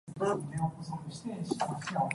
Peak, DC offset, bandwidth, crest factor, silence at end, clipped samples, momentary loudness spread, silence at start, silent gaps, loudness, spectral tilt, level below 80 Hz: -14 dBFS; under 0.1%; 11.5 kHz; 20 dB; 0 s; under 0.1%; 8 LU; 0.05 s; none; -35 LUFS; -6 dB/octave; -64 dBFS